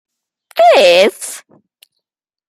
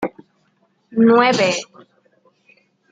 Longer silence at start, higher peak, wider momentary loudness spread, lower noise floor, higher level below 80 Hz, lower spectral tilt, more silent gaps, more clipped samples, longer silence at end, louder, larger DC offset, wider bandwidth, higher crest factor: first, 0.55 s vs 0 s; about the same, 0 dBFS vs -2 dBFS; first, 19 LU vs 16 LU; first, -81 dBFS vs -63 dBFS; about the same, -66 dBFS vs -68 dBFS; second, -2 dB/octave vs -4.5 dB/octave; neither; neither; second, 1.1 s vs 1.3 s; first, -9 LUFS vs -16 LUFS; neither; first, 15.5 kHz vs 9.2 kHz; about the same, 14 dB vs 18 dB